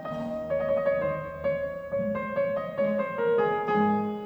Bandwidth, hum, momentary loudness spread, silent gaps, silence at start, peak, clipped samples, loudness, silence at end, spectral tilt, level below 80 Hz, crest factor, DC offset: 5.6 kHz; none; 6 LU; none; 0 s; -14 dBFS; under 0.1%; -28 LUFS; 0 s; -8.5 dB/octave; -56 dBFS; 14 dB; under 0.1%